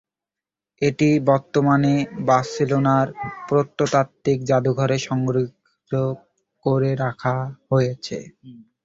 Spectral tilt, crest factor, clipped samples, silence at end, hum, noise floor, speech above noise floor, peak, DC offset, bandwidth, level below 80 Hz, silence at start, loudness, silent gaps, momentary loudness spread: -7 dB/octave; 18 dB; under 0.1%; 0.25 s; none; -89 dBFS; 68 dB; -4 dBFS; under 0.1%; 7.8 kHz; -56 dBFS; 0.8 s; -21 LUFS; none; 9 LU